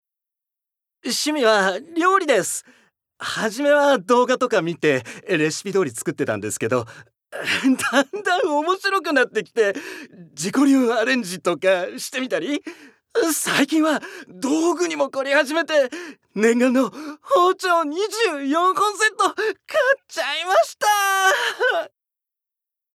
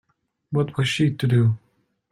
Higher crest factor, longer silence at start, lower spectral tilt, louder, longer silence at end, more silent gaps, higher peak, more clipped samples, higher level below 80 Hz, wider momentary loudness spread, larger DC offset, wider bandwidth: about the same, 18 dB vs 14 dB; first, 1.05 s vs 0.5 s; second, -3 dB/octave vs -6.5 dB/octave; about the same, -20 LUFS vs -22 LUFS; first, 1.1 s vs 0.55 s; neither; first, -2 dBFS vs -8 dBFS; neither; second, -76 dBFS vs -58 dBFS; first, 10 LU vs 7 LU; neither; first, 16 kHz vs 12 kHz